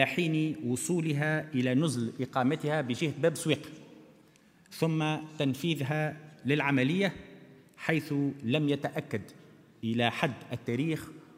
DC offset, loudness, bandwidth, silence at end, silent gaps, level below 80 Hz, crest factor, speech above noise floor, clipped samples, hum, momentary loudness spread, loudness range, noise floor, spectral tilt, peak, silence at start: under 0.1%; -31 LUFS; 16 kHz; 0.15 s; none; -72 dBFS; 22 dB; 31 dB; under 0.1%; none; 10 LU; 3 LU; -61 dBFS; -5.5 dB/octave; -8 dBFS; 0 s